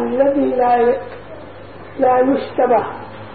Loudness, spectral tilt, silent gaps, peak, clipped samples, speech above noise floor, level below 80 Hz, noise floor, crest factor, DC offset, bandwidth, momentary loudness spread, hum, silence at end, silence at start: -16 LUFS; -11.5 dB/octave; none; -2 dBFS; under 0.1%; 20 dB; -52 dBFS; -36 dBFS; 14 dB; 0.8%; 4.7 kHz; 21 LU; none; 0 s; 0 s